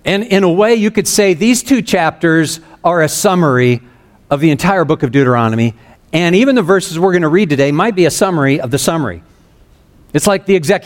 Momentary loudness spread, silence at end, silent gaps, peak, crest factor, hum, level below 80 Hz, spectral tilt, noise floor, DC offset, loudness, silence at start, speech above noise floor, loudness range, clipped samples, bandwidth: 6 LU; 0 s; none; 0 dBFS; 12 dB; none; -44 dBFS; -5 dB/octave; -46 dBFS; under 0.1%; -12 LUFS; 0.05 s; 34 dB; 2 LU; under 0.1%; 17 kHz